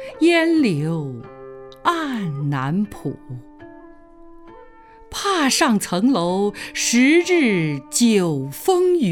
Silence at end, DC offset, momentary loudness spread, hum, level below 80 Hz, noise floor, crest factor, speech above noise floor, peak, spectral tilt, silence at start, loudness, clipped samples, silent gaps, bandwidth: 0 s; under 0.1%; 16 LU; none; -52 dBFS; -45 dBFS; 16 dB; 26 dB; -4 dBFS; -4.5 dB/octave; 0 s; -19 LUFS; under 0.1%; none; 17.5 kHz